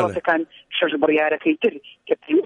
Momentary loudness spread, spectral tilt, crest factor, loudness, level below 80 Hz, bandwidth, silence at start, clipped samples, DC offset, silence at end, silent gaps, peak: 8 LU; -6 dB/octave; 16 dB; -21 LUFS; -62 dBFS; 8.6 kHz; 0 s; under 0.1%; under 0.1%; 0 s; none; -6 dBFS